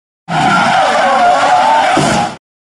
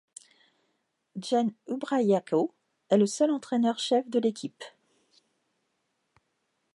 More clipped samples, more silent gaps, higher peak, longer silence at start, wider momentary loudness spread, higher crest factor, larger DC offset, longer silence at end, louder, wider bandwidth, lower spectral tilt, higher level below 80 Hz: neither; neither; first, 0 dBFS vs -10 dBFS; second, 0.3 s vs 1.15 s; second, 6 LU vs 15 LU; second, 10 dB vs 20 dB; neither; second, 0.25 s vs 2.05 s; first, -10 LUFS vs -27 LUFS; about the same, 11.5 kHz vs 11.5 kHz; second, -4 dB/octave vs -5.5 dB/octave; first, -44 dBFS vs -84 dBFS